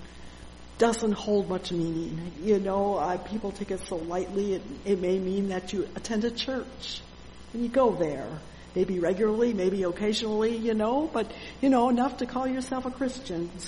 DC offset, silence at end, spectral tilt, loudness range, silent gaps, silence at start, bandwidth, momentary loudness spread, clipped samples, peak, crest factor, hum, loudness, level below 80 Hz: under 0.1%; 0 s; -5.5 dB/octave; 4 LU; none; 0 s; 11 kHz; 12 LU; under 0.1%; -10 dBFS; 18 dB; none; -28 LUFS; -50 dBFS